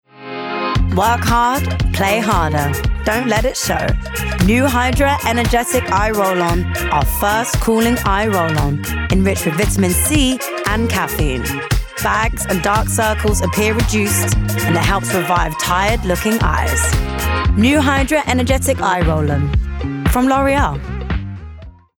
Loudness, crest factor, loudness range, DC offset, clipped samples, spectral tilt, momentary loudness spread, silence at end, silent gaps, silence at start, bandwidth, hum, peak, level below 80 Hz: -16 LUFS; 12 dB; 1 LU; under 0.1%; under 0.1%; -4.5 dB/octave; 6 LU; 0.3 s; none; 0.15 s; over 20 kHz; none; -2 dBFS; -24 dBFS